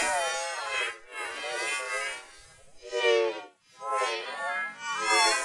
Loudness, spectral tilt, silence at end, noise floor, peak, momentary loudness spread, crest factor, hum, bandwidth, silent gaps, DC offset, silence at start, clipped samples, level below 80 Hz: -29 LUFS; 0.5 dB/octave; 0 s; -53 dBFS; -10 dBFS; 13 LU; 20 dB; none; 11.5 kHz; none; under 0.1%; 0 s; under 0.1%; -70 dBFS